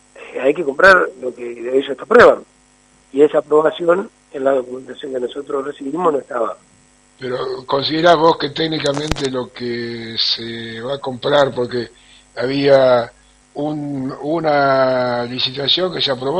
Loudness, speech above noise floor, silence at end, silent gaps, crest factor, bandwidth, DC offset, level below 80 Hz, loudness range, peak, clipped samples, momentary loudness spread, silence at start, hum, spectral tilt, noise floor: -17 LUFS; 36 dB; 0 s; none; 18 dB; 10.5 kHz; under 0.1%; -48 dBFS; 6 LU; 0 dBFS; under 0.1%; 15 LU; 0.15 s; none; -5 dB/octave; -52 dBFS